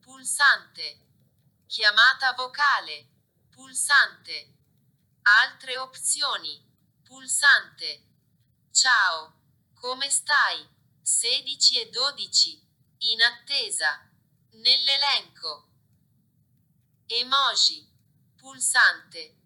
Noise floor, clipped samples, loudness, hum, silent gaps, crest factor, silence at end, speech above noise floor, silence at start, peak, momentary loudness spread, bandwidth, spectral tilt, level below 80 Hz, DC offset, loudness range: -67 dBFS; under 0.1%; -21 LUFS; none; none; 20 dB; 0.2 s; 43 dB; 0.15 s; -6 dBFS; 18 LU; 19 kHz; 3 dB/octave; -84 dBFS; under 0.1%; 3 LU